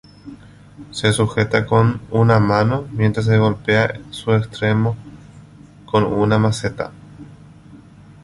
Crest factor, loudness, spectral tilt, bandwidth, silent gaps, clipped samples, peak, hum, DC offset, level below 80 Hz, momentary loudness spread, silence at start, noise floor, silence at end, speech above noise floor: 18 dB; -18 LUFS; -6.5 dB/octave; 11.5 kHz; none; under 0.1%; -2 dBFS; 50 Hz at -40 dBFS; under 0.1%; -44 dBFS; 9 LU; 0.25 s; -42 dBFS; 0.45 s; 26 dB